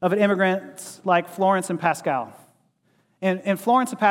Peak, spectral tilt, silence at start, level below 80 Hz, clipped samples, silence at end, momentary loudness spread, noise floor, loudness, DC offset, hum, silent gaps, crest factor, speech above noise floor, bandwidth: -4 dBFS; -5.5 dB/octave; 0 s; -80 dBFS; under 0.1%; 0 s; 9 LU; -65 dBFS; -22 LUFS; under 0.1%; none; none; 18 dB; 44 dB; 16.5 kHz